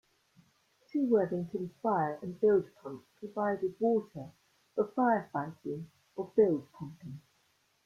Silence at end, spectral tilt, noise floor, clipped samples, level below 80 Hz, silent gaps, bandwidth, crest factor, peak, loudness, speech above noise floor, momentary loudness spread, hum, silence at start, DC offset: 0.65 s; -9 dB/octave; -72 dBFS; under 0.1%; -74 dBFS; none; 7 kHz; 20 dB; -14 dBFS; -32 LUFS; 41 dB; 19 LU; none; 0.95 s; under 0.1%